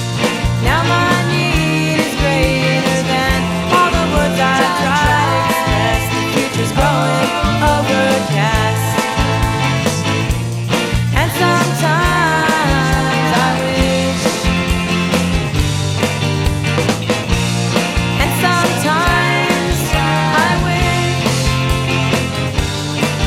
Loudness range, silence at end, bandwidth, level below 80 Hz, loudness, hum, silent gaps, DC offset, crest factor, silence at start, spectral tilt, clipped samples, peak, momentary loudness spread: 2 LU; 0 s; 16.5 kHz; -26 dBFS; -14 LUFS; none; none; under 0.1%; 14 dB; 0 s; -4.5 dB/octave; under 0.1%; 0 dBFS; 4 LU